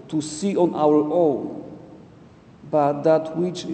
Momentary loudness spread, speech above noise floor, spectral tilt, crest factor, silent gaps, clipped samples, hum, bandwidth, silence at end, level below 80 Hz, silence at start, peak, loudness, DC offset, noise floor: 12 LU; 27 dB; -6.5 dB/octave; 16 dB; none; under 0.1%; none; 9 kHz; 0 s; -62 dBFS; 0 s; -6 dBFS; -21 LUFS; under 0.1%; -48 dBFS